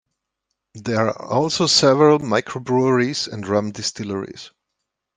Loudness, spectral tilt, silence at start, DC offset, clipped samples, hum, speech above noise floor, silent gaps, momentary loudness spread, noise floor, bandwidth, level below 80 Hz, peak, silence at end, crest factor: -19 LUFS; -4.5 dB/octave; 0.75 s; under 0.1%; under 0.1%; none; 60 dB; none; 14 LU; -79 dBFS; 10 kHz; -60 dBFS; -2 dBFS; 0.7 s; 18 dB